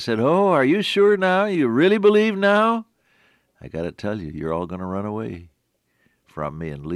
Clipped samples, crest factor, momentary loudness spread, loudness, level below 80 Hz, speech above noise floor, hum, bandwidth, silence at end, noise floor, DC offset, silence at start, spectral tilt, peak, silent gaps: under 0.1%; 16 dB; 15 LU; -20 LUFS; -56 dBFS; 50 dB; none; 12 kHz; 0 s; -69 dBFS; under 0.1%; 0 s; -6.5 dB/octave; -6 dBFS; none